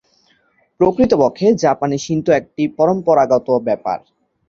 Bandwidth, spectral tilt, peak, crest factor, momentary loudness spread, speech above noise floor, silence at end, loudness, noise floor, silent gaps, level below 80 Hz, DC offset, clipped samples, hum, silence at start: 7.6 kHz; -6.5 dB/octave; 0 dBFS; 16 dB; 7 LU; 44 dB; 0.5 s; -16 LUFS; -59 dBFS; none; -50 dBFS; under 0.1%; under 0.1%; none; 0.8 s